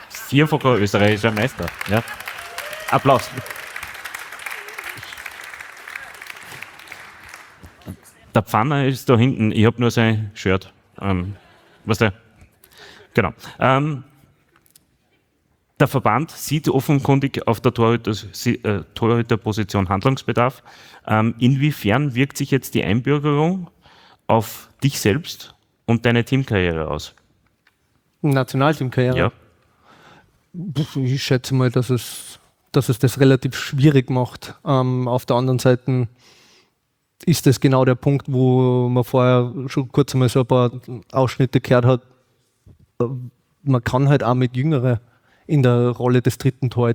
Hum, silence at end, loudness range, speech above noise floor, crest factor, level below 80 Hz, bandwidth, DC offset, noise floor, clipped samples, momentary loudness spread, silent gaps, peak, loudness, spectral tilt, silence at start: none; 0 s; 6 LU; 52 dB; 18 dB; -52 dBFS; over 20 kHz; under 0.1%; -70 dBFS; under 0.1%; 16 LU; none; 0 dBFS; -19 LUFS; -6.5 dB/octave; 0 s